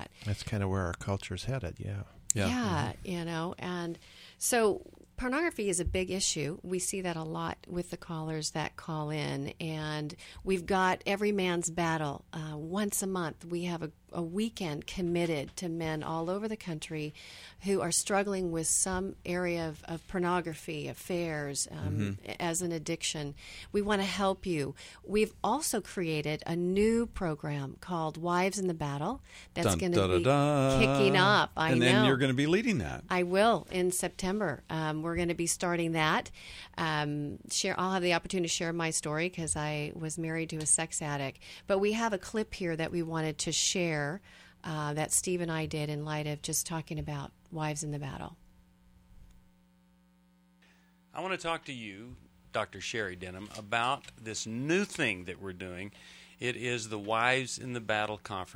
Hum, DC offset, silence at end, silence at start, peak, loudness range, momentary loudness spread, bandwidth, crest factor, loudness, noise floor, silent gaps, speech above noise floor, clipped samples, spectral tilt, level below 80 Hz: none; under 0.1%; 0 s; 0 s; -4 dBFS; 9 LU; 12 LU; 16.5 kHz; 28 dB; -32 LUFS; -65 dBFS; none; 33 dB; under 0.1%; -4 dB/octave; -54 dBFS